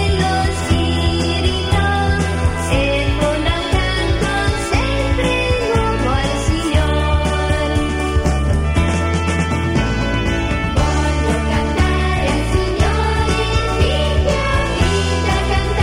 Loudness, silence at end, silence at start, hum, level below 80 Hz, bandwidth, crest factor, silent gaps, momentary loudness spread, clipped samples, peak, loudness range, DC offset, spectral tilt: -17 LUFS; 0 s; 0 s; none; -20 dBFS; 14.5 kHz; 12 dB; none; 2 LU; under 0.1%; -4 dBFS; 1 LU; under 0.1%; -5.5 dB/octave